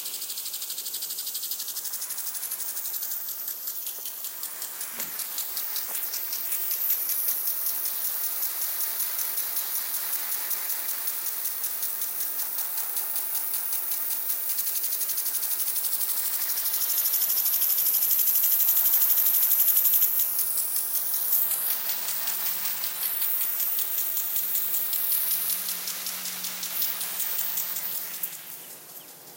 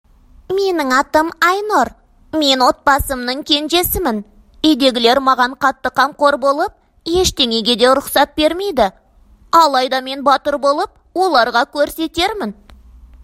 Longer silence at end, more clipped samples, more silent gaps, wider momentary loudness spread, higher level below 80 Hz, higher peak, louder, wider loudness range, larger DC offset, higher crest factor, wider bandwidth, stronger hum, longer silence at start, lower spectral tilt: second, 0 s vs 0.7 s; neither; neither; first, 11 LU vs 8 LU; second, under -90 dBFS vs -40 dBFS; second, -6 dBFS vs 0 dBFS; second, -24 LUFS vs -15 LUFS; first, 10 LU vs 1 LU; neither; about the same, 20 dB vs 16 dB; about the same, 17.5 kHz vs 16 kHz; neither; second, 0 s vs 0.5 s; second, 2 dB/octave vs -3 dB/octave